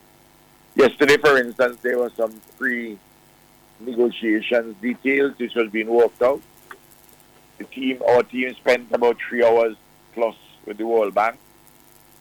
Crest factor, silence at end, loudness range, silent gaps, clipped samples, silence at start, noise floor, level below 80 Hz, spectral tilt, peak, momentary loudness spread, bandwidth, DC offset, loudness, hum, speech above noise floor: 16 dB; 0.85 s; 3 LU; none; under 0.1%; 0.75 s; -53 dBFS; -62 dBFS; -4.5 dB/octave; -6 dBFS; 12 LU; 18 kHz; under 0.1%; -20 LUFS; 50 Hz at -65 dBFS; 33 dB